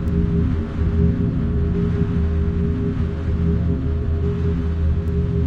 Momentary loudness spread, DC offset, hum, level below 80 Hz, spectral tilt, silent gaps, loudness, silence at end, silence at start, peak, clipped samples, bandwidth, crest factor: 3 LU; under 0.1%; none; -26 dBFS; -10.5 dB/octave; none; -21 LUFS; 0 s; 0 s; -6 dBFS; under 0.1%; 4.7 kHz; 12 dB